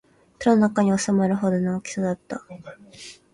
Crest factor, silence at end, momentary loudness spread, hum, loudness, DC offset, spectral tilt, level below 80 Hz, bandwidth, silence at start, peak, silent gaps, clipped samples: 18 dB; 0.2 s; 23 LU; none; -22 LUFS; under 0.1%; -6 dB/octave; -60 dBFS; 11 kHz; 0.4 s; -6 dBFS; none; under 0.1%